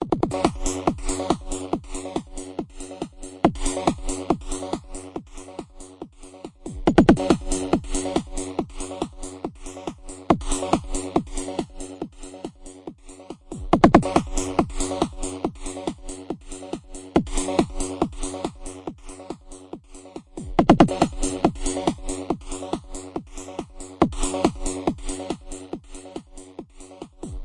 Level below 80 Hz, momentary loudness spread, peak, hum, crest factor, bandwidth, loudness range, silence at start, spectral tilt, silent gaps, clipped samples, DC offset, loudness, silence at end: -36 dBFS; 21 LU; 0 dBFS; none; 24 dB; 11.5 kHz; 5 LU; 0 s; -5 dB/octave; none; under 0.1%; under 0.1%; -25 LUFS; 0 s